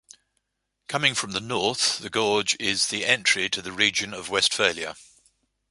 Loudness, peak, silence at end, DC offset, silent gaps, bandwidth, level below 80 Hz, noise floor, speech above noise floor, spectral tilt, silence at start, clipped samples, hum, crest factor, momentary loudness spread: -23 LUFS; -2 dBFS; 0.65 s; under 0.1%; none; 11.5 kHz; -62 dBFS; -77 dBFS; 52 dB; -1.5 dB/octave; 0.9 s; under 0.1%; none; 24 dB; 7 LU